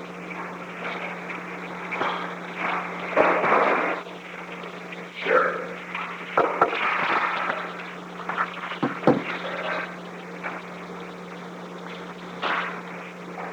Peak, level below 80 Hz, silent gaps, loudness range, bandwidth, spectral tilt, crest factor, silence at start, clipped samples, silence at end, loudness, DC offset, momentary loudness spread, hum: -2 dBFS; -68 dBFS; none; 8 LU; 20 kHz; -5.5 dB/octave; 24 dB; 0 s; under 0.1%; 0 s; -27 LUFS; under 0.1%; 15 LU; none